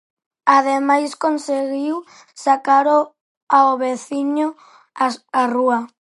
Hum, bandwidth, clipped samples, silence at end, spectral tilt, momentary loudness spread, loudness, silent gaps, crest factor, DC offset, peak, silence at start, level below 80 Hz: none; 11.5 kHz; under 0.1%; 0.15 s; -3.5 dB/octave; 9 LU; -18 LUFS; 3.21-3.47 s; 18 dB; under 0.1%; -2 dBFS; 0.45 s; -76 dBFS